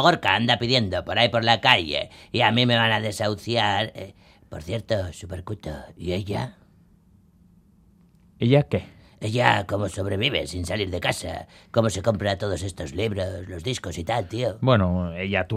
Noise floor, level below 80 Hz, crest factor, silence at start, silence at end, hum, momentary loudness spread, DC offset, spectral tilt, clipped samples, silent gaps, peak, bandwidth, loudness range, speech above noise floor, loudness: -56 dBFS; -52 dBFS; 24 dB; 0 s; 0 s; none; 15 LU; under 0.1%; -5 dB/octave; under 0.1%; none; 0 dBFS; 15 kHz; 11 LU; 33 dB; -23 LUFS